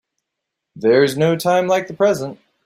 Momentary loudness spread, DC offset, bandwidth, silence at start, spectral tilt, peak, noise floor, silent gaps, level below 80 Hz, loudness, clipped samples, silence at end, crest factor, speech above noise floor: 8 LU; under 0.1%; 15.5 kHz; 0.75 s; -5.5 dB/octave; -2 dBFS; -80 dBFS; none; -60 dBFS; -17 LUFS; under 0.1%; 0.3 s; 16 dB; 64 dB